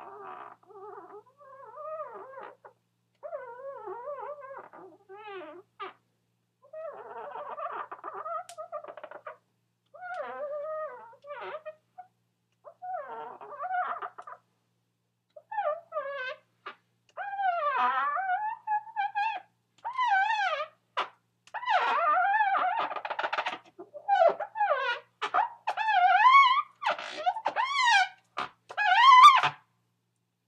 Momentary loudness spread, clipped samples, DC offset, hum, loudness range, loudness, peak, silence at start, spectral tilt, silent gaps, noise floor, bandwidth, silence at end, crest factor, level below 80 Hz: 23 LU; under 0.1%; under 0.1%; none; 19 LU; -26 LUFS; -4 dBFS; 0 s; -1 dB/octave; none; -78 dBFS; 13.5 kHz; 0.95 s; 24 dB; under -90 dBFS